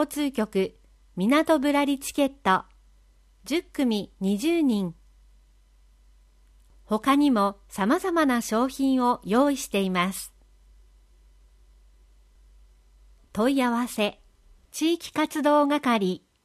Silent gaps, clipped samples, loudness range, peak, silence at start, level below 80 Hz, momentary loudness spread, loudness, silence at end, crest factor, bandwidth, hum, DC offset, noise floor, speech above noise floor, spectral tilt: none; under 0.1%; 7 LU; -8 dBFS; 0 s; -56 dBFS; 8 LU; -25 LUFS; 0.3 s; 18 dB; 15 kHz; none; under 0.1%; -58 dBFS; 34 dB; -5 dB/octave